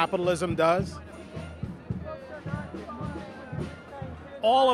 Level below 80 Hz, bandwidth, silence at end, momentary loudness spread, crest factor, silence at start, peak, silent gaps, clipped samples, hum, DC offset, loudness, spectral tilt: -50 dBFS; 13 kHz; 0 s; 16 LU; 20 dB; 0 s; -8 dBFS; none; under 0.1%; none; under 0.1%; -30 LUFS; -6 dB/octave